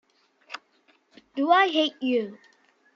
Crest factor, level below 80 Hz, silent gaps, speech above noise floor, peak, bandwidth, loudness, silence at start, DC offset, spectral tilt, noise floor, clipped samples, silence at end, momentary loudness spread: 20 dB; -84 dBFS; none; 41 dB; -6 dBFS; 7.4 kHz; -23 LUFS; 0.5 s; under 0.1%; -4 dB/octave; -64 dBFS; under 0.1%; 0.6 s; 22 LU